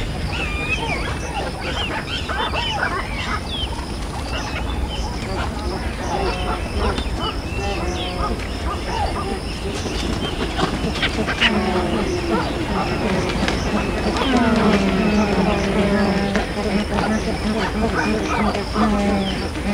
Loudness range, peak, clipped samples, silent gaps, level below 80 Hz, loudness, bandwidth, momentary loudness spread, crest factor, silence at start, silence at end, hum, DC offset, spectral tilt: 6 LU; 0 dBFS; under 0.1%; none; -28 dBFS; -21 LUFS; 16 kHz; 8 LU; 20 dB; 0 s; 0 s; none; under 0.1%; -5 dB/octave